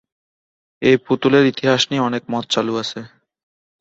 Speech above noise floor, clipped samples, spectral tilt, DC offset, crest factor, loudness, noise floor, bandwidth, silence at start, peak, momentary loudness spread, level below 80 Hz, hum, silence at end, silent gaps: over 73 dB; under 0.1%; -5 dB/octave; under 0.1%; 18 dB; -17 LUFS; under -90 dBFS; 8 kHz; 0.8 s; -2 dBFS; 9 LU; -60 dBFS; none; 0.75 s; none